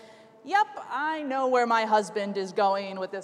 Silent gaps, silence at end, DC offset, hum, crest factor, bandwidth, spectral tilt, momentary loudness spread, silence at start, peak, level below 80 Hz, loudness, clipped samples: none; 0 s; under 0.1%; none; 16 dB; 12 kHz; -4 dB/octave; 8 LU; 0.05 s; -10 dBFS; -88 dBFS; -26 LUFS; under 0.1%